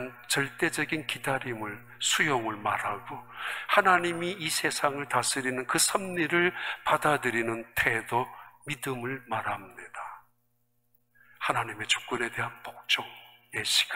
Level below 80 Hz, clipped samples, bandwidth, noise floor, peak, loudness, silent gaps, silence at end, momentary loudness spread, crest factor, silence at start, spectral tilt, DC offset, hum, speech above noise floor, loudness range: -66 dBFS; under 0.1%; 16 kHz; -75 dBFS; -6 dBFS; -28 LUFS; none; 0 s; 13 LU; 24 dB; 0 s; -2.5 dB/octave; 0.1%; none; 46 dB; 7 LU